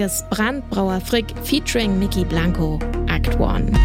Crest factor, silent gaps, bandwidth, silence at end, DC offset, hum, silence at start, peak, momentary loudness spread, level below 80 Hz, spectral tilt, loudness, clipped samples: 14 dB; none; 16.5 kHz; 0 s; under 0.1%; none; 0 s; -4 dBFS; 3 LU; -26 dBFS; -5 dB/octave; -20 LUFS; under 0.1%